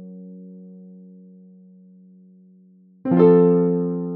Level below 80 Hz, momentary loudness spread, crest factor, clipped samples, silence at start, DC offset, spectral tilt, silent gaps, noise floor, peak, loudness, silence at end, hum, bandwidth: -72 dBFS; 27 LU; 20 dB; under 0.1%; 0 s; under 0.1%; -10.5 dB/octave; none; -52 dBFS; -2 dBFS; -17 LUFS; 0 s; none; 3.8 kHz